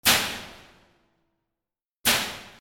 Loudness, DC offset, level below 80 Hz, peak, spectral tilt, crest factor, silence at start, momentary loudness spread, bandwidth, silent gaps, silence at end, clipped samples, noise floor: -24 LUFS; under 0.1%; -56 dBFS; -4 dBFS; -0.5 dB/octave; 24 dB; 0.05 s; 16 LU; 18 kHz; 1.97-2.04 s; 0.1 s; under 0.1%; -89 dBFS